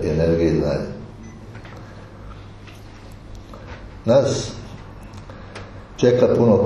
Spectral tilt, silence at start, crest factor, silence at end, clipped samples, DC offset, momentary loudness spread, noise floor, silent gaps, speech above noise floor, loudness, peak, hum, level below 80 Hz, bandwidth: -7 dB/octave; 0 s; 20 dB; 0 s; under 0.1%; under 0.1%; 24 LU; -39 dBFS; none; 22 dB; -19 LUFS; -2 dBFS; none; -40 dBFS; 11 kHz